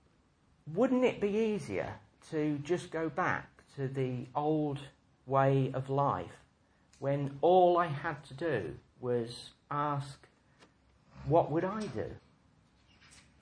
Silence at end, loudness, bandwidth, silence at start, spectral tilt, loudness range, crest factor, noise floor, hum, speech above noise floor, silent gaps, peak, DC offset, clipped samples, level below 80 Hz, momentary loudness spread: 1.25 s; -33 LUFS; 10.5 kHz; 0.65 s; -7.5 dB/octave; 6 LU; 20 dB; -68 dBFS; none; 37 dB; none; -14 dBFS; under 0.1%; under 0.1%; -64 dBFS; 15 LU